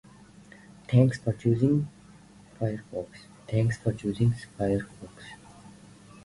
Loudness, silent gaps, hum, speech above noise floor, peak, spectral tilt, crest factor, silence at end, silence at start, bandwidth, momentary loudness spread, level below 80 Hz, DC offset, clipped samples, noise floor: -28 LUFS; none; none; 26 dB; -8 dBFS; -8 dB/octave; 20 dB; 0.55 s; 0.9 s; 11.5 kHz; 23 LU; -54 dBFS; under 0.1%; under 0.1%; -52 dBFS